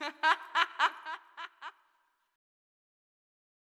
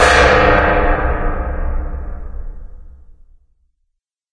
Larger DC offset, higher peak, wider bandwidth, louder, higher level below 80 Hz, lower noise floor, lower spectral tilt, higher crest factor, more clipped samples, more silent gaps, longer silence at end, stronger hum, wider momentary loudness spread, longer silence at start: neither; second, -12 dBFS vs 0 dBFS; first, 13.5 kHz vs 11 kHz; second, -30 LUFS vs -14 LUFS; second, under -90 dBFS vs -22 dBFS; first, -75 dBFS vs -71 dBFS; second, 1.5 dB/octave vs -4.5 dB/octave; first, 26 dB vs 16 dB; neither; neither; first, 2 s vs 1.4 s; neither; second, 19 LU vs 23 LU; about the same, 0 s vs 0 s